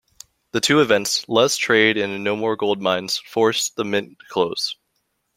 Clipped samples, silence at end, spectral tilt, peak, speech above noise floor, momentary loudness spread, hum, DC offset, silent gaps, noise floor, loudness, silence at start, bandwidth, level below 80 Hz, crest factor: under 0.1%; 0.65 s; -3 dB/octave; -2 dBFS; 52 dB; 9 LU; none; under 0.1%; none; -71 dBFS; -20 LUFS; 0.55 s; 16.5 kHz; -62 dBFS; 20 dB